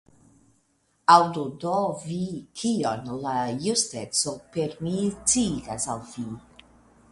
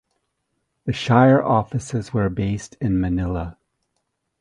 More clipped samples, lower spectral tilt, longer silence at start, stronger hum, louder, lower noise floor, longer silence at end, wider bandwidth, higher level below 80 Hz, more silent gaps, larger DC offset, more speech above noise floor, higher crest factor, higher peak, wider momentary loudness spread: neither; second, -3.5 dB/octave vs -7 dB/octave; first, 1.1 s vs 0.85 s; neither; second, -25 LUFS vs -20 LUFS; second, -68 dBFS vs -75 dBFS; second, 0.7 s vs 0.9 s; about the same, 11.5 kHz vs 11 kHz; second, -56 dBFS vs -40 dBFS; neither; neither; second, 43 dB vs 55 dB; about the same, 24 dB vs 22 dB; about the same, -2 dBFS vs 0 dBFS; about the same, 14 LU vs 14 LU